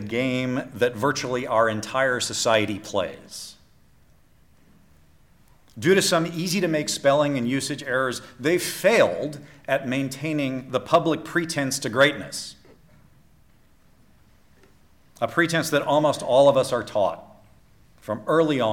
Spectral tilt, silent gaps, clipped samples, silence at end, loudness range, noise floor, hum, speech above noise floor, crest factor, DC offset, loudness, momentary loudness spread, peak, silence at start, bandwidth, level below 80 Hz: -4 dB/octave; none; under 0.1%; 0 s; 6 LU; -55 dBFS; none; 32 dB; 18 dB; under 0.1%; -23 LUFS; 12 LU; -6 dBFS; 0 s; 17 kHz; -60 dBFS